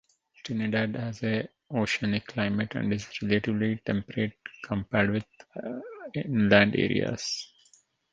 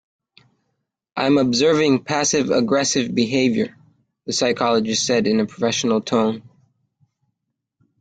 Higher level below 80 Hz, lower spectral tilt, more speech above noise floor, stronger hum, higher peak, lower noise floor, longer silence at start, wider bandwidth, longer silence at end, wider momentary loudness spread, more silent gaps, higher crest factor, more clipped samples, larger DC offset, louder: about the same, -56 dBFS vs -58 dBFS; first, -5.5 dB/octave vs -4 dB/octave; second, 36 dB vs 60 dB; neither; about the same, -4 dBFS vs -4 dBFS; second, -64 dBFS vs -79 dBFS; second, 0.45 s vs 1.15 s; second, 7.8 kHz vs 9.4 kHz; second, 0.7 s vs 1.6 s; first, 14 LU vs 8 LU; neither; first, 26 dB vs 16 dB; neither; neither; second, -28 LUFS vs -19 LUFS